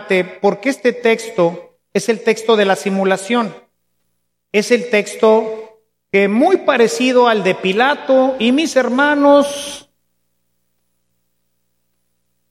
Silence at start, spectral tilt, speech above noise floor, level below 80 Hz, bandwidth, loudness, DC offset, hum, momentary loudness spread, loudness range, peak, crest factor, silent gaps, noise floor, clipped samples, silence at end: 0 s; -4.5 dB/octave; 57 dB; -64 dBFS; 14.5 kHz; -15 LUFS; under 0.1%; 60 Hz at -45 dBFS; 8 LU; 4 LU; 0 dBFS; 16 dB; none; -71 dBFS; under 0.1%; 2.7 s